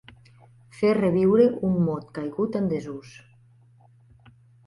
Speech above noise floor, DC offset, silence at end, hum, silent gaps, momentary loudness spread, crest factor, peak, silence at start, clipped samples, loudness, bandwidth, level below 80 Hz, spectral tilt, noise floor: 33 dB; under 0.1%; 1.55 s; none; none; 13 LU; 18 dB; -6 dBFS; 0.75 s; under 0.1%; -23 LUFS; 11 kHz; -58 dBFS; -9 dB/octave; -56 dBFS